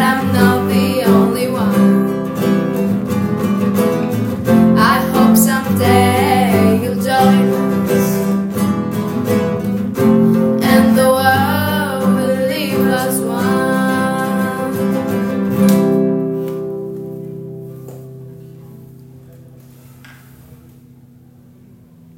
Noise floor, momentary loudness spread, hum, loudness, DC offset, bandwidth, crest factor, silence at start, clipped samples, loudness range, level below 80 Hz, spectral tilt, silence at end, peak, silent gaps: -43 dBFS; 11 LU; none; -14 LUFS; under 0.1%; 16.5 kHz; 14 dB; 0 s; under 0.1%; 7 LU; -52 dBFS; -6 dB/octave; 1.65 s; 0 dBFS; none